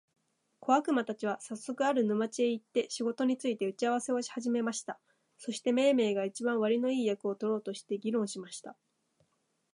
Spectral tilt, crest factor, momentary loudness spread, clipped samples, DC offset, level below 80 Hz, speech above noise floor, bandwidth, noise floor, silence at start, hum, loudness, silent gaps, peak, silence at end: -4.5 dB/octave; 20 dB; 12 LU; under 0.1%; under 0.1%; -86 dBFS; 45 dB; 11 kHz; -77 dBFS; 0.6 s; none; -32 LUFS; none; -12 dBFS; 1 s